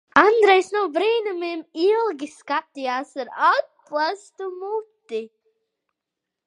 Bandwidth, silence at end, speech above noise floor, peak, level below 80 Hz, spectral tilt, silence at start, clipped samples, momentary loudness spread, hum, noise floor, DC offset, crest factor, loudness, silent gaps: 10.5 kHz; 1.2 s; 63 dB; 0 dBFS; -68 dBFS; -3 dB/octave; 0.15 s; under 0.1%; 16 LU; none; -84 dBFS; under 0.1%; 22 dB; -22 LUFS; none